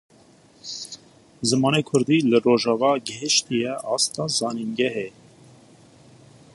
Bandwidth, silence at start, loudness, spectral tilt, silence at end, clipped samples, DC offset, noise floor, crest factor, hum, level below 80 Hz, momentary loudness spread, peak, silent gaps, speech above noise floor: 11.5 kHz; 0.65 s; -22 LUFS; -4 dB/octave; 1.45 s; under 0.1%; under 0.1%; -53 dBFS; 18 dB; none; -66 dBFS; 16 LU; -6 dBFS; none; 32 dB